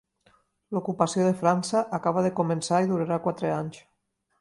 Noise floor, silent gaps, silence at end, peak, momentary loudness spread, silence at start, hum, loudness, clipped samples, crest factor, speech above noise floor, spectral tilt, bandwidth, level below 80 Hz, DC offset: -65 dBFS; none; 0.6 s; -8 dBFS; 8 LU; 0.7 s; none; -26 LUFS; under 0.1%; 20 dB; 39 dB; -6 dB/octave; 11.5 kHz; -68 dBFS; under 0.1%